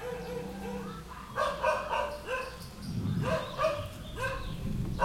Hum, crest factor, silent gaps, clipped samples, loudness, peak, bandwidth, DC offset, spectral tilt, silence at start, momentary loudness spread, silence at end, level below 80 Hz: none; 18 dB; none; under 0.1%; -34 LUFS; -16 dBFS; 16.5 kHz; under 0.1%; -5.5 dB/octave; 0 s; 10 LU; 0 s; -46 dBFS